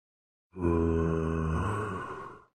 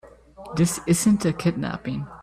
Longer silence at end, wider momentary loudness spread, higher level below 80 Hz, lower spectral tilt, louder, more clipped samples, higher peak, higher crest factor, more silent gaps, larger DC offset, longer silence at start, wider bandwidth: first, 0.15 s vs 0 s; about the same, 13 LU vs 11 LU; first, -42 dBFS vs -50 dBFS; first, -8.5 dB/octave vs -5.5 dB/octave; second, -31 LUFS vs -23 LUFS; neither; second, -16 dBFS vs -8 dBFS; about the same, 16 dB vs 16 dB; neither; neither; first, 0.55 s vs 0.05 s; second, 9.6 kHz vs 15 kHz